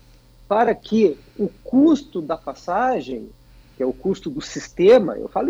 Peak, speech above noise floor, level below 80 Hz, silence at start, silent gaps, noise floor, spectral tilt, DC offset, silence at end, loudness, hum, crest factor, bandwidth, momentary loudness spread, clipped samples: -4 dBFS; 30 dB; -50 dBFS; 0.5 s; none; -49 dBFS; -6 dB/octave; under 0.1%; 0 s; -20 LUFS; none; 16 dB; 8 kHz; 14 LU; under 0.1%